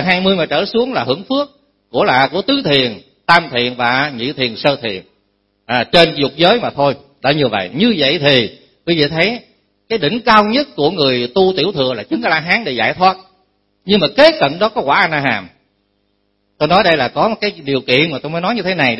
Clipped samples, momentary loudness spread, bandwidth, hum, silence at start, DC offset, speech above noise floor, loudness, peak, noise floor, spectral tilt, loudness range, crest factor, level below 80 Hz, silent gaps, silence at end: under 0.1%; 9 LU; 11 kHz; 50 Hz at -55 dBFS; 0 s; under 0.1%; 50 dB; -14 LUFS; 0 dBFS; -63 dBFS; -6 dB/octave; 2 LU; 14 dB; -48 dBFS; none; 0 s